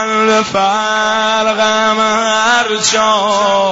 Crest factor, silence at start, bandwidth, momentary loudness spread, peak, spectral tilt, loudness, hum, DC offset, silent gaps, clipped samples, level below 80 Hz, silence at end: 12 dB; 0 s; 8 kHz; 2 LU; 0 dBFS; -2 dB/octave; -12 LUFS; none; 0.3%; none; under 0.1%; -52 dBFS; 0 s